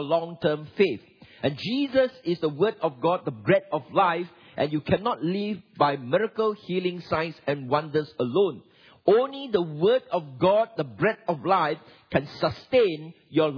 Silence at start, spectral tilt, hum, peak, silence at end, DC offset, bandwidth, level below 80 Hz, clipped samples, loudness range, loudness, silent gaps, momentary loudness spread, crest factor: 0 s; -8 dB/octave; none; -6 dBFS; 0 s; under 0.1%; 5.4 kHz; -62 dBFS; under 0.1%; 2 LU; -26 LUFS; none; 7 LU; 20 dB